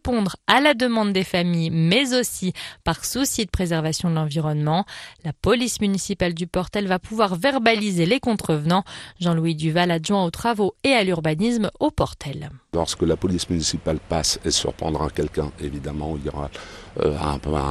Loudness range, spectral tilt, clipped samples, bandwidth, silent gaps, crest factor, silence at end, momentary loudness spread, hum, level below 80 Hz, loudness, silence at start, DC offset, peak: 3 LU; -4.5 dB/octave; under 0.1%; 13.5 kHz; none; 22 dB; 0 s; 10 LU; none; -40 dBFS; -22 LUFS; 0.05 s; under 0.1%; 0 dBFS